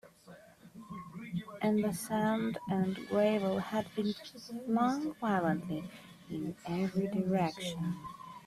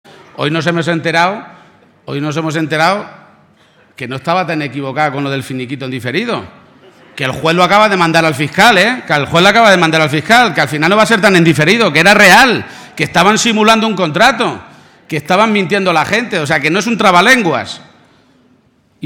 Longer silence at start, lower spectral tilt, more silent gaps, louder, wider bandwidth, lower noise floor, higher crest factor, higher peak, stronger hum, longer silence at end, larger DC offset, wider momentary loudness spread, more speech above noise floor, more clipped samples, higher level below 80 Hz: second, 0.05 s vs 0.4 s; first, -6.5 dB/octave vs -4 dB/octave; neither; second, -34 LUFS vs -10 LUFS; second, 14 kHz vs 20 kHz; first, -56 dBFS vs -52 dBFS; about the same, 16 dB vs 12 dB; second, -18 dBFS vs 0 dBFS; neither; about the same, 0 s vs 0 s; neither; about the same, 14 LU vs 13 LU; second, 23 dB vs 41 dB; second, under 0.1% vs 0.4%; second, -68 dBFS vs -48 dBFS